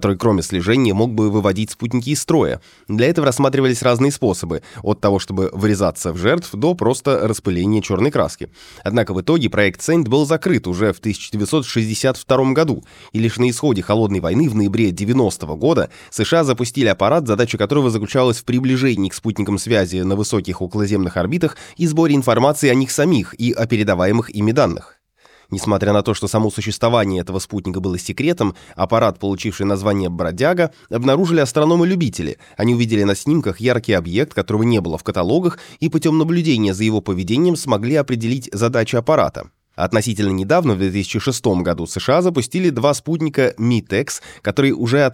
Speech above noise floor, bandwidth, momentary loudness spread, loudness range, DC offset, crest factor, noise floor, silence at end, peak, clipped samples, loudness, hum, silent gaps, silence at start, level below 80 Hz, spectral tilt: 35 dB; 16.5 kHz; 7 LU; 2 LU; under 0.1%; 16 dB; -52 dBFS; 0 s; -2 dBFS; under 0.1%; -17 LUFS; none; none; 0 s; -46 dBFS; -6 dB/octave